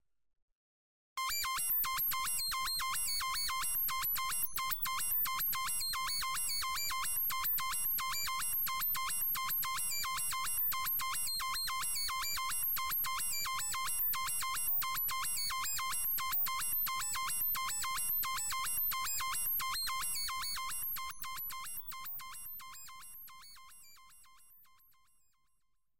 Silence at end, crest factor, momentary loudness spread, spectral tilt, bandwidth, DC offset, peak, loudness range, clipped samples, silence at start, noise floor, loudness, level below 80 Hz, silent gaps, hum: 0 s; 14 dB; 9 LU; 2 dB/octave; 17 kHz; 0.6%; -22 dBFS; 8 LU; under 0.1%; 0 s; -83 dBFS; -34 LUFS; -60 dBFS; 0.42-1.16 s; none